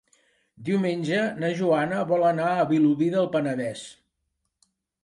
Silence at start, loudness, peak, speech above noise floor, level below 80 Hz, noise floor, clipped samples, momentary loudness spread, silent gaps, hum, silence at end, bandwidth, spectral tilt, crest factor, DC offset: 0.6 s; -24 LUFS; -10 dBFS; 55 dB; -72 dBFS; -78 dBFS; under 0.1%; 10 LU; none; none; 1.1 s; 11.5 kHz; -7 dB/octave; 14 dB; under 0.1%